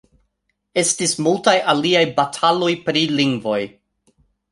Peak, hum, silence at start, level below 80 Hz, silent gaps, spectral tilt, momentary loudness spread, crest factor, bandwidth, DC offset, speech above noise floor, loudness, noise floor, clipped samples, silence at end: -2 dBFS; none; 0.75 s; -62 dBFS; none; -3.5 dB/octave; 7 LU; 18 dB; 11.5 kHz; under 0.1%; 54 dB; -18 LUFS; -72 dBFS; under 0.1%; 0.85 s